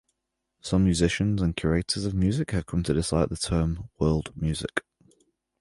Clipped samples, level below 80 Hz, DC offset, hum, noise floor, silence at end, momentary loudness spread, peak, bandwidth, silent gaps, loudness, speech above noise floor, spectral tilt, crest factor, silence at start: under 0.1%; -38 dBFS; under 0.1%; none; -81 dBFS; 0.8 s; 7 LU; -6 dBFS; 11.5 kHz; none; -26 LUFS; 56 dB; -5.5 dB/octave; 20 dB; 0.65 s